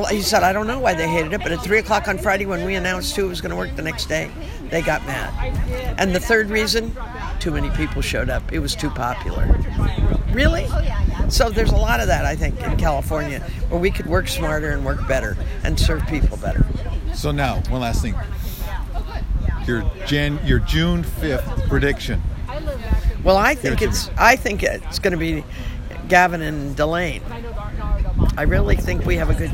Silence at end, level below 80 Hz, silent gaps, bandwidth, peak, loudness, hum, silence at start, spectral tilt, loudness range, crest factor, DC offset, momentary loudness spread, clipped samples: 0 s; -24 dBFS; none; 16.5 kHz; 0 dBFS; -21 LUFS; none; 0 s; -5 dB/octave; 4 LU; 20 dB; under 0.1%; 10 LU; under 0.1%